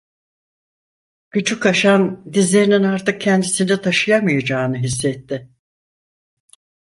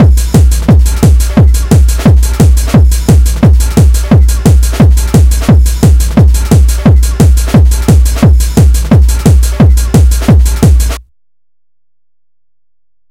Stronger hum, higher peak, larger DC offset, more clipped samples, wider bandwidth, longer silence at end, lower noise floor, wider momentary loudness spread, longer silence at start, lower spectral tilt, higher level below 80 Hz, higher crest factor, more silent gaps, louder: neither; about the same, -2 dBFS vs 0 dBFS; neither; second, under 0.1% vs 6%; second, 11.5 kHz vs 16.5 kHz; second, 1.4 s vs 2.1 s; first, under -90 dBFS vs -84 dBFS; first, 9 LU vs 1 LU; first, 1.35 s vs 0 s; second, -4.5 dB/octave vs -6.5 dB/octave; second, -54 dBFS vs -8 dBFS; first, 16 dB vs 6 dB; neither; second, -17 LUFS vs -7 LUFS